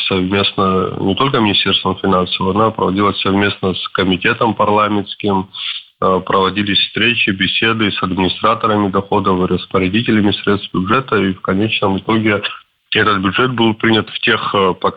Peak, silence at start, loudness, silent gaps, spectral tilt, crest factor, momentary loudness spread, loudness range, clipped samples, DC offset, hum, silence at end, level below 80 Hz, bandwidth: 0 dBFS; 0 s; -14 LUFS; none; -8 dB/octave; 14 dB; 5 LU; 1 LU; under 0.1%; under 0.1%; none; 0 s; -48 dBFS; 5 kHz